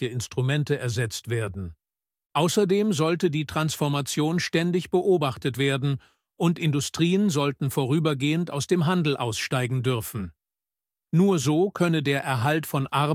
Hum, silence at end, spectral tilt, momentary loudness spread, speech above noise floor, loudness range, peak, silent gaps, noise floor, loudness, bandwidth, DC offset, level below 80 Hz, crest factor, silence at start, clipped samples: none; 0 s; -5.5 dB/octave; 7 LU; over 66 dB; 2 LU; -8 dBFS; 2.26-2.30 s; under -90 dBFS; -25 LUFS; 16.5 kHz; under 0.1%; -58 dBFS; 16 dB; 0 s; under 0.1%